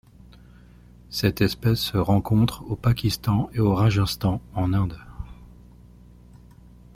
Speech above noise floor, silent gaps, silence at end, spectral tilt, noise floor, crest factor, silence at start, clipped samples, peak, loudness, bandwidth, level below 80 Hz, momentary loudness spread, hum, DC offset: 27 dB; none; 1.5 s; -6.5 dB/octave; -49 dBFS; 20 dB; 1.1 s; under 0.1%; -4 dBFS; -23 LUFS; 16 kHz; -42 dBFS; 11 LU; 60 Hz at -40 dBFS; under 0.1%